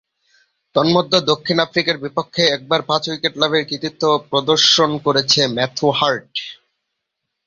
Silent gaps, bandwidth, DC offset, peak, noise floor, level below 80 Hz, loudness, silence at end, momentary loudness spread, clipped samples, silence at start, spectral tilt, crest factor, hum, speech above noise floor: none; 7.6 kHz; under 0.1%; 0 dBFS; -78 dBFS; -58 dBFS; -16 LUFS; 0.95 s; 9 LU; under 0.1%; 0.75 s; -3.5 dB/octave; 18 dB; none; 60 dB